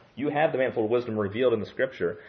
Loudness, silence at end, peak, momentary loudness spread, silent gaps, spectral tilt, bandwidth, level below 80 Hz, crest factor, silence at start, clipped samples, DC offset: -27 LUFS; 0 s; -10 dBFS; 5 LU; none; -8.5 dB/octave; 6.2 kHz; -68 dBFS; 16 dB; 0.15 s; under 0.1%; under 0.1%